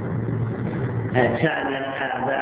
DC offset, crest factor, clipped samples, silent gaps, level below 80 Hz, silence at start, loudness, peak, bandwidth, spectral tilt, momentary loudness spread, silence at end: under 0.1%; 18 dB; under 0.1%; none; -48 dBFS; 0 s; -24 LUFS; -6 dBFS; 4 kHz; -10.5 dB/octave; 6 LU; 0 s